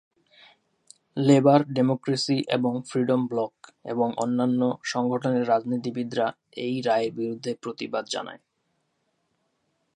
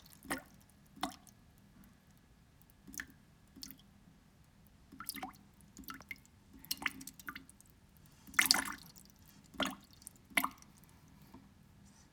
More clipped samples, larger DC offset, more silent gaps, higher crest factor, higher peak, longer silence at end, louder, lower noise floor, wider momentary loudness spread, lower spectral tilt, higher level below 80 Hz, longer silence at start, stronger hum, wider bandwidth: neither; neither; neither; second, 22 dB vs 40 dB; about the same, -4 dBFS vs -4 dBFS; first, 1.6 s vs 0.1 s; first, -25 LUFS vs -38 LUFS; first, -74 dBFS vs -64 dBFS; second, 12 LU vs 28 LU; first, -6 dB/octave vs -1 dB/octave; second, -74 dBFS vs -68 dBFS; first, 1.15 s vs 0 s; neither; second, 10.5 kHz vs over 20 kHz